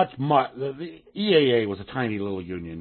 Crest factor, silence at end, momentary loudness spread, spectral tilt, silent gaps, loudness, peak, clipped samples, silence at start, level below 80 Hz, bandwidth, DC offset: 18 dB; 0 s; 14 LU; -10.5 dB/octave; none; -24 LUFS; -6 dBFS; under 0.1%; 0 s; -58 dBFS; 4.4 kHz; under 0.1%